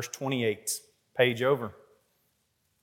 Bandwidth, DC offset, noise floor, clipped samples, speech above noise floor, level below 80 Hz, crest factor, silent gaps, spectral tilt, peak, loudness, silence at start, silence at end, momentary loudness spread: 17.5 kHz; under 0.1%; -74 dBFS; under 0.1%; 46 dB; -80 dBFS; 22 dB; none; -4 dB/octave; -8 dBFS; -29 LUFS; 0 s; 1.1 s; 12 LU